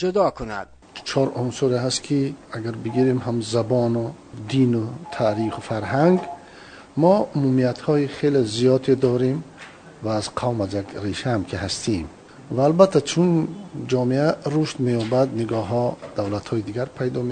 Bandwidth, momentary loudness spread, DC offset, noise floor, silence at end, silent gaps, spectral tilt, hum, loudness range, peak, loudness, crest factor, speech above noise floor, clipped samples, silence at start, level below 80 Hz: 9.6 kHz; 13 LU; under 0.1%; -44 dBFS; 0 s; none; -6.5 dB/octave; none; 3 LU; 0 dBFS; -22 LUFS; 20 dB; 22 dB; under 0.1%; 0 s; -54 dBFS